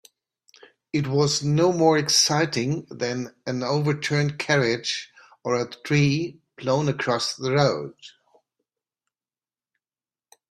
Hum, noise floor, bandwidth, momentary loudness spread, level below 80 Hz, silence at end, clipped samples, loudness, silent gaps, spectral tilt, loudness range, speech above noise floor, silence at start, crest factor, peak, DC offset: none; under -90 dBFS; 13.5 kHz; 12 LU; -62 dBFS; 2.4 s; under 0.1%; -23 LUFS; none; -4.5 dB/octave; 5 LU; over 67 dB; 0.95 s; 20 dB; -6 dBFS; under 0.1%